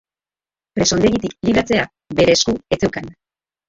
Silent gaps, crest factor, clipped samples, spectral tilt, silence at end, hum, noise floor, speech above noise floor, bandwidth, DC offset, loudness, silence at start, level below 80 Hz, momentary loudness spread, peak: none; 18 dB; under 0.1%; -4 dB/octave; 0.55 s; none; under -90 dBFS; over 73 dB; 8 kHz; under 0.1%; -17 LUFS; 0.75 s; -42 dBFS; 11 LU; -2 dBFS